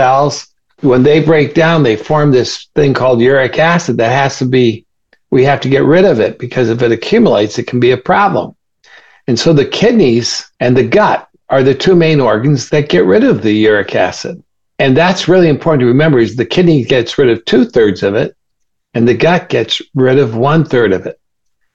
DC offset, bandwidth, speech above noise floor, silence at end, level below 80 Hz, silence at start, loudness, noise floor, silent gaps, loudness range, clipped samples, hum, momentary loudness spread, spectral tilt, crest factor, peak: under 0.1%; 8 kHz; 60 dB; 0.6 s; -44 dBFS; 0 s; -10 LUFS; -70 dBFS; none; 2 LU; under 0.1%; none; 7 LU; -6 dB/octave; 10 dB; 0 dBFS